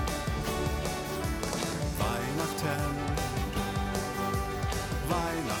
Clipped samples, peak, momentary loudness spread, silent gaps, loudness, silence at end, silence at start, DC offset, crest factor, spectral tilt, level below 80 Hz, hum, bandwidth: under 0.1%; -16 dBFS; 2 LU; none; -32 LUFS; 0 s; 0 s; under 0.1%; 16 dB; -4.5 dB/octave; -38 dBFS; none; 17.5 kHz